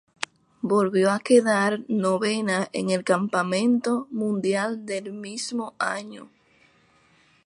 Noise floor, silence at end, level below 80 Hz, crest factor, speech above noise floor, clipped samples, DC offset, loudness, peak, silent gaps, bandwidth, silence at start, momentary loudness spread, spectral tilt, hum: -60 dBFS; 1.2 s; -72 dBFS; 20 dB; 37 dB; under 0.1%; under 0.1%; -24 LUFS; -4 dBFS; none; 11.5 kHz; 0.65 s; 15 LU; -5 dB/octave; none